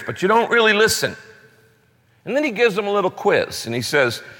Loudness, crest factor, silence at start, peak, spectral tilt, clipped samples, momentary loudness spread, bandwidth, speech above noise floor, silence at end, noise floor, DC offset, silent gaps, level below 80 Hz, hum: -18 LUFS; 16 dB; 0 s; -4 dBFS; -3.5 dB/octave; under 0.1%; 10 LU; 17 kHz; 39 dB; 0.05 s; -58 dBFS; under 0.1%; none; -58 dBFS; none